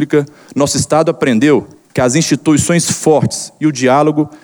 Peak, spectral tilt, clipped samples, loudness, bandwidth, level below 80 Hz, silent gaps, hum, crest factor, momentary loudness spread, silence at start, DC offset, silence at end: 0 dBFS; -5 dB/octave; under 0.1%; -13 LUFS; over 20 kHz; -46 dBFS; none; none; 12 dB; 6 LU; 0 s; under 0.1%; 0.1 s